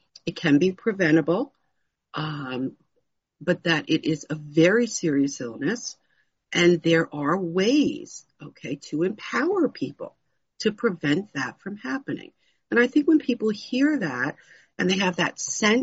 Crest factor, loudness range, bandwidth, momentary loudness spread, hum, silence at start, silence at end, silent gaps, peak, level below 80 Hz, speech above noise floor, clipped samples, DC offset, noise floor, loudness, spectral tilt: 18 dB; 5 LU; 8 kHz; 15 LU; none; 0.25 s; 0 s; none; -6 dBFS; -68 dBFS; 52 dB; under 0.1%; under 0.1%; -76 dBFS; -24 LUFS; -4.5 dB/octave